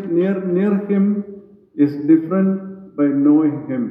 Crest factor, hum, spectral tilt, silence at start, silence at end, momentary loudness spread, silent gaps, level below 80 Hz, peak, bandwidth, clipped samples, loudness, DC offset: 14 dB; none; -12 dB/octave; 0 s; 0 s; 11 LU; none; -70 dBFS; -4 dBFS; 5 kHz; under 0.1%; -17 LUFS; under 0.1%